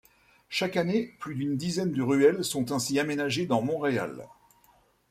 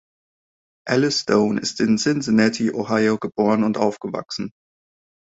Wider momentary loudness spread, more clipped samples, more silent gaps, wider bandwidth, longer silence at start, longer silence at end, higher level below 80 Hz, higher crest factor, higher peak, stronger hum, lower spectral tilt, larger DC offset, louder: about the same, 11 LU vs 11 LU; neither; neither; first, 16 kHz vs 8 kHz; second, 0.5 s vs 0.85 s; first, 0.85 s vs 0.7 s; second, -66 dBFS vs -60 dBFS; about the same, 20 dB vs 20 dB; second, -10 dBFS vs -2 dBFS; neither; about the same, -5 dB/octave vs -5 dB/octave; neither; second, -28 LUFS vs -20 LUFS